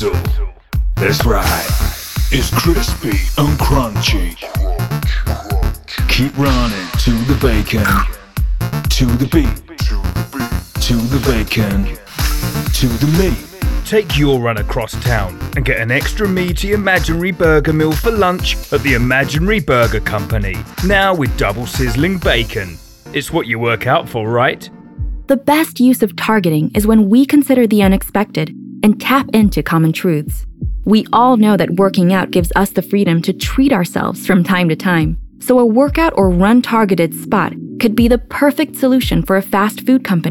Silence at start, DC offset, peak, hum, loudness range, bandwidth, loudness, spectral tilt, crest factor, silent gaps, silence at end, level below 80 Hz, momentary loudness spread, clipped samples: 0 s; under 0.1%; 0 dBFS; none; 4 LU; 18 kHz; -14 LUFS; -5.5 dB/octave; 12 dB; none; 0 s; -22 dBFS; 9 LU; under 0.1%